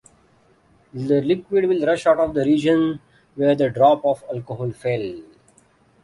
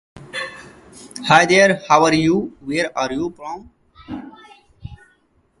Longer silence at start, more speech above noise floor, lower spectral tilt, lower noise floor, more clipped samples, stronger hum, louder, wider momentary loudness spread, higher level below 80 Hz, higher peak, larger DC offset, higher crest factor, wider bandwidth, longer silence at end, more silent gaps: first, 0.95 s vs 0.15 s; second, 38 dB vs 44 dB; first, -7 dB/octave vs -4.5 dB/octave; about the same, -57 dBFS vs -60 dBFS; neither; neither; second, -20 LUFS vs -17 LUFS; second, 15 LU vs 22 LU; second, -56 dBFS vs -50 dBFS; second, -4 dBFS vs 0 dBFS; neither; about the same, 18 dB vs 20 dB; about the same, 11.5 kHz vs 11.5 kHz; first, 0.8 s vs 0.65 s; neither